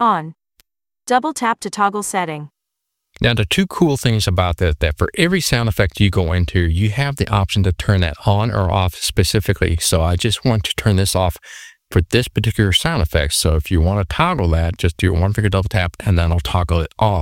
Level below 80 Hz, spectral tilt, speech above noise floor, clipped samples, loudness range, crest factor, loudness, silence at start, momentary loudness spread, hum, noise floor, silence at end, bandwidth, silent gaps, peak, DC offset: -28 dBFS; -5 dB/octave; 62 dB; under 0.1%; 2 LU; 16 dB; -17 LUFS; 0 s; 4 LU; none; -78 dBFS; 0 s; 16.5 kHz; none; -2 dBFS; under 0.1%